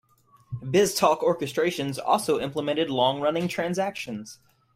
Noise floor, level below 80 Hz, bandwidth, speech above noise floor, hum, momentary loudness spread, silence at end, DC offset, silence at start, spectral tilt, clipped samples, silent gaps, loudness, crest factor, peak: -50 dBFS; -62 dBFS; 16 kHz; 25 dB; none; 13 LU; 0.4 s; under 0.1%; 0.5 s; -4.5 dB/octave; under 0.1%; none; -25 LUFS; 20 dB; -6 dBFS